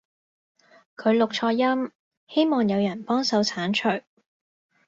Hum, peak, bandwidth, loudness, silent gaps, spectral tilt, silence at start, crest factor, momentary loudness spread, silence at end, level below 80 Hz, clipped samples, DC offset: none; -10 dBFS; 7.8 kHz; -24 LUFS; 1.95-2.11 s, 2.17-2.27 s; -5 dB/octave; 1 s; 16 dB; 6 LU; 0.85 s; -70 dBFS; under 0.1%; under 0.1%